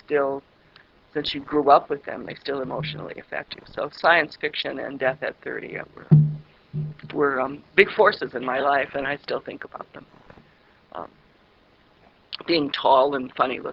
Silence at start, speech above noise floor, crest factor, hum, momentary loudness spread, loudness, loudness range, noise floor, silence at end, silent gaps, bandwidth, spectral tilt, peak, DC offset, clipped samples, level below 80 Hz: 0.1 s; 34 dB; 24 dB; none; 18 LU; -23 LUFS; 9 LU; -58 dBFS; 0 s; none; 5.8 kHz; -8.5 dB/octave; 0 dBFS; under 0.1%; under 0.1%; -58 dBFS